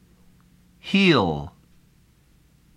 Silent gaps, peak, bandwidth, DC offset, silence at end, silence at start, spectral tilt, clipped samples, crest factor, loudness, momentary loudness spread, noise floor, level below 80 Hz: none; -6 dBFS; 10.5 kHz; under 0.1%; 1.3 s; 0.85 s; -6 dB/octave; under 0.1%; 20 dB; -20 LUFS; 23 LU; -58 dBFS; -52 dBFS